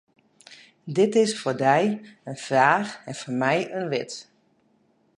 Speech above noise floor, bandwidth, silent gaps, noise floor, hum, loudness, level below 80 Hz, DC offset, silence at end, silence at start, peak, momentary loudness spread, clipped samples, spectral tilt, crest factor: 41 dB; 11.5 kHz; none; -65 dBFS; none; -23 LUFS; -76 dBFS; under 0.1%; 0.95 s; 0.5 s; -4 dBFS; 16 LU; under 0.1%; -5 dB/octave; 20 dB